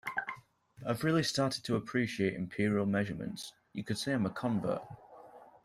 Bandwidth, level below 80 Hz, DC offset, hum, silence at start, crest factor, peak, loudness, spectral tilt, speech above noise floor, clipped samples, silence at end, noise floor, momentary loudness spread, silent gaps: 15 kHz; -68 dBFS; under 0.1%; none; 0.05 s; 18 dB; -18 dBFS; -34 LUFS; -5.5 dB/octave; 22 dB; under 0.1%; 0.15 s; -55 dBFS; 14 LU; none